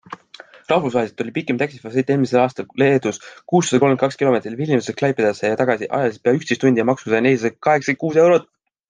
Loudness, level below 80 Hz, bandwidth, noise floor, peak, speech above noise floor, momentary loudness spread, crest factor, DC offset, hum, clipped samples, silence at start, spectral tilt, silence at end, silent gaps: -18 LUFS; -64 dBFS; 10 kHz; -44 dBFS; -2 dBFS; 26 dB; 7 LU; 16 dB; under 0.1%; none; under 0.1%; 0.1 s; -6 dB/octave; 0.5 s; none